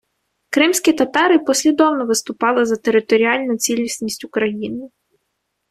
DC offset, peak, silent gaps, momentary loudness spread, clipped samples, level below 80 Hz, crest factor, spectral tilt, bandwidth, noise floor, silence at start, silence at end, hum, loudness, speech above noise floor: under 0.1%; -2 dBFS; none; 9 LU; under 0.1%; -60 dBFS; 16 dB; -2.5 dB/octave; 14.5 kHz; -73 dBFS; 0.5 s; 0.85 s; none; -17 LUFS; 56 dB